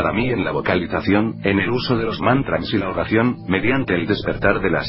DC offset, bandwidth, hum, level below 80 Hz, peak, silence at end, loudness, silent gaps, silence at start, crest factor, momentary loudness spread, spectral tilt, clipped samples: under 0.1%; 5.8 kHz; none; -38 dBFS; 0 dBFS; 0 s; -19 LUFS; none; 0 s; 18 dB; 3 LU; -11 dB/octave; under 0.1%